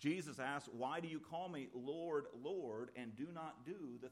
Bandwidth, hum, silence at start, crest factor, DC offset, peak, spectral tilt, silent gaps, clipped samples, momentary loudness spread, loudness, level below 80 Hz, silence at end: 14.5 kHz; none; 0 s; 18 dB; under 0.1%; -28 dBFS; -5.5 dB/octave; none; under 0.1%; 7 LU; -47 LUFS; -86 dBFS; 0 s